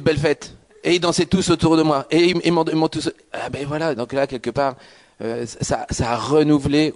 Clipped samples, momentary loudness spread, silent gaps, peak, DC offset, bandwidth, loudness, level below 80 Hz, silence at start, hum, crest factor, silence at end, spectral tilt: under 0.1%; 11 LU; none; -6 dBFS; under 0.1%; 11 kHz; -20 LUFS; -44 dBFS; 0 s; none; 14 dB; 0 s; -5.5 dB/octave